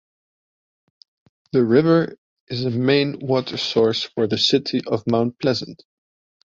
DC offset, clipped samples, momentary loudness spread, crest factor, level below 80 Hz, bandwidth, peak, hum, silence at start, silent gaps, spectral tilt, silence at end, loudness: under 0.1%; under 0.1%; 9 LU; 18 dB; -60 dBFS; 7.8 kHz; -2 dBFS; none; 1.55 s; 2.18-2.47 s; -6 dB/octave; 0.75 s; -20 LUFS